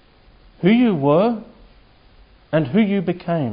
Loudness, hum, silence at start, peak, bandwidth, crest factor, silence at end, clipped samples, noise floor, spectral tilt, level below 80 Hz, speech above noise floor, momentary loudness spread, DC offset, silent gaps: -18 LUFS; none; 0.6 s; -4 dBFS; 5.2 kHz; 16 dB; 0 s; under 0.1%; -50 dBFS; -12.5 dB/octave; -52 dBFS; 33 dB; 7 LU; under 0.1%; none